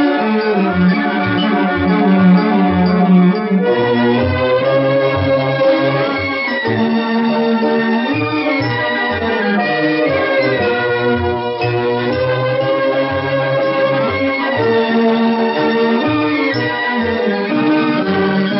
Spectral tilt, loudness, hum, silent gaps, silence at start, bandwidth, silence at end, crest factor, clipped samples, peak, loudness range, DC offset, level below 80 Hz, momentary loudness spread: -5 dB/octave; -14 LUFS; none; none; 0 s; 5.8 kHz; 0 s; 12 dB; under 0.1%; -2 dBFS; 3 LU; under 0.1%; -48 dBFS; 4 LU